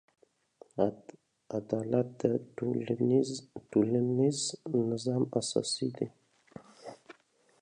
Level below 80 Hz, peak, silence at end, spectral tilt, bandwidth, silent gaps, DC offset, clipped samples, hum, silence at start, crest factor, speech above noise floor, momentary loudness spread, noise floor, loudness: -72 dBFS; -12 dBFS; 0.5 s; -6 dB/octave; 10.5 kHz; none; under 0.1%; under 0.1%; none; 0.75 s; 22 dB; 33 dB; 16 LU; -64 dBFS; -32 LUFS